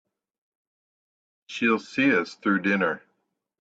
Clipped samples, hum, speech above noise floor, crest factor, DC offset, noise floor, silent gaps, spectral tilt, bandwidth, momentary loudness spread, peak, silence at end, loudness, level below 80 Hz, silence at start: under 0.1%; none; 53 dB; 18 dB; under 0.1%; -77 dBFS; none; -6 dB/octave; 8 kHz; 8 LU; -10 dBFS; 0.65 s; -24 LUFS; -72 dBFS; 1.5 s